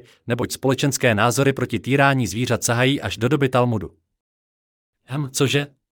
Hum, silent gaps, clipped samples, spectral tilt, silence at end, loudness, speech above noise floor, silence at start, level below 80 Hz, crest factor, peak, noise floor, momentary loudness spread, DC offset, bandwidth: none; 4.20-4.93 s; under 0.1%; -5 dB/octave; 0.3 s; -20 LUFS; over 70 dB; 0.25 s; -56 dBFS; 18 dB; -4 dBFS; under -90 dBFS; 9 LU; under 0.1%; 18.5 kHz